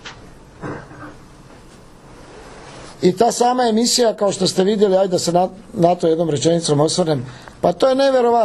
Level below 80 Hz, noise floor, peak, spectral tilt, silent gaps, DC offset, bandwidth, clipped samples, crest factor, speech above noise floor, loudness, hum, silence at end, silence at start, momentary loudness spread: -50 dBFS; -42 dBFS; 0 dBFS; -4.5 dB/octave; none; under 0.1%; 13 kHz; under 0.1%; 18 dB; 27 dB; -16 LUFS; none; 0 s; 0.05 s; 21 LU